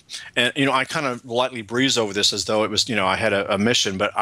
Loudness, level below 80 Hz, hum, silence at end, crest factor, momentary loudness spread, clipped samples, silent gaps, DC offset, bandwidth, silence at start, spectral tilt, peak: -20 LUFS; -60 dBFS; none; 0 s; 18 dB; 5 LU; under 0.1%; none; under 0.1%; 16 kHz; 0.1 s; -3 dB/octave; -4 dBFS